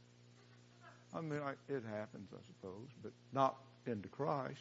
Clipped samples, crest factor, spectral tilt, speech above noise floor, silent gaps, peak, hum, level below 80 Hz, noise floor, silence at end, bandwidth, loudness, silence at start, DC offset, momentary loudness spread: under 0.1%; 24 dB; -6 dB/octave; 21 dB; none; -20 dBFS; 60 Hz at -65 dBFS; -86 dBFS; -64 dBFS; 0 s; 7.6 kHz; -43 LUFS; 0 s; under 0.1%; 24 LU